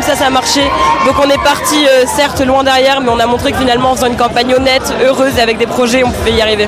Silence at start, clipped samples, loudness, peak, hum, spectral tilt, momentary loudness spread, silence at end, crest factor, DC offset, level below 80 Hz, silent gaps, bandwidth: 0 s; under 0.1%; -10 LUFS; 0 dBFS; none; -3.5 dB/octave; 3 LU; 0 s; 10 dB; under 0.1%; -32 dBFS; none; 16 kHz